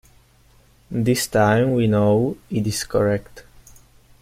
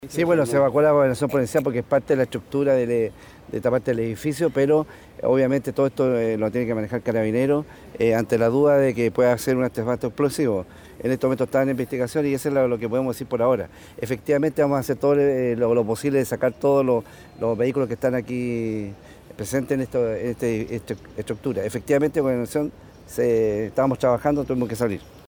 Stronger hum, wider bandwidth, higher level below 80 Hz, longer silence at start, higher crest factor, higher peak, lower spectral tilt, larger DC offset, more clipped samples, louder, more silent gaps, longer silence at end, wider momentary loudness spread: neither; second, 16 kHz vs over 20 kHz; about the same, -48 dBFS vs -52 dBFS; first, 0.9 s vs 0 s; about the same, 16 dB vs 16 dB; about the same, -6 dBFS vs -6 dBFS; about the same, -6 dB/octave vs -7 dB/octave; neither; neither; about the same, -20 LUFS vs -22 LUFS; neither; first, 0.8 s vs 0.1 s; about the same, 7 LU vs 9 LU